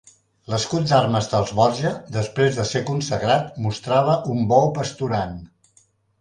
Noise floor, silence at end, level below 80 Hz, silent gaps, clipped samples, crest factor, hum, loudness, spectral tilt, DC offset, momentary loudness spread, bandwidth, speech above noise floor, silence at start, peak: -60 dBFS; 0.75 s; -50 dBFS; none; under 0.1%; 18 dB; none; -21 LUFS; -5.5 dB/octave; under 0.1%; 9 LU; 10.5 kHz; 39 dB; 0.5 s; -2 dBFS